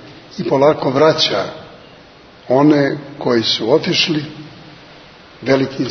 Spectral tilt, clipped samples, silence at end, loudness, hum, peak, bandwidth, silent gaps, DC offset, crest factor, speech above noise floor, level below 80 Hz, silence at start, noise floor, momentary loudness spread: -5 dB/octave; under 0.1%; 0 s; -15 LUFS; none; 0 dBFS; 6.6 kHz; none; under 0.1%; 16 dB; 27 dB; -56 dBFS; 0 s; -42 dBFS; 18 LU